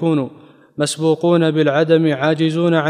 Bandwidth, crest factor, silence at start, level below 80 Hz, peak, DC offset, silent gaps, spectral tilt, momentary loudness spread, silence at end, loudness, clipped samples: 12 kHz; 14 dB; 0 s; -70 dBFS; -2 dBFS; under 0.1%; none; -6 dB/octave; 8 LU; 0 s; -16 LUFS; under 0.1%